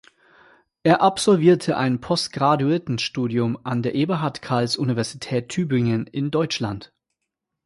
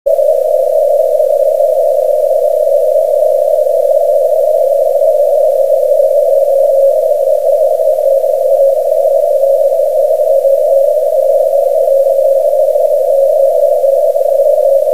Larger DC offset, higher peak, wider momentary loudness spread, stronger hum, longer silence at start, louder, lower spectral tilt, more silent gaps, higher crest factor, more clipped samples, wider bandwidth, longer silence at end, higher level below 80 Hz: second, under 0.1% vs 3%; second, -4 dBFS vs 0 dBFS; first, 8 LU vs 2 LU; neither; first, 0.85 s vs 0.05 s; second, -21 LUFS vs -10 LUFS; first, -6 dB/octave vs -2.5 dB/octave; neither; first, 18 dB vs 10 dB; neither; second, 11.5 kHz vs 16 kHz; first, 0.8 s vs 0 s; about the same, -58 dBFS vs -62 dBFS